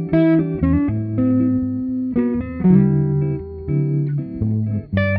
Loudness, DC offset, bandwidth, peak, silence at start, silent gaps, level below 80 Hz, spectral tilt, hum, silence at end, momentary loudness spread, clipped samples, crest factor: -19 LUFS; under 0.1%; 4.9 kHz; -4 dBFS; 0 s; none; -36 dBFS; -13 dB/octave; none; 0 s; 8 LU; under 0.1%; 14 dB